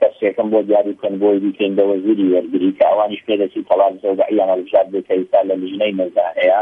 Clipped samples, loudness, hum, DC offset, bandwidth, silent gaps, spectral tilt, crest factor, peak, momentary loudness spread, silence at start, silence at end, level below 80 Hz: under 0.1%; -16 LUFS; none; under 0.1%; 3.8 kHz; none; -8.5 dB/octave; 14 dB; -2 dBFS; 4 LU; 0 s; 0 s; -66 dBFS